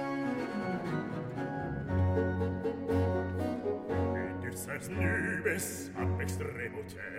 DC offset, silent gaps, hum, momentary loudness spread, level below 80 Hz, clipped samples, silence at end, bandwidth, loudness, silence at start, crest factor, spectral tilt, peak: under 0.1%; none; none; 7 LU; -54 dBFS; under 0.1%; 0 s; 16 kHz; -34 LUFS; 0 s; 16 dB; -6.5 dB/octave; -18 dBFS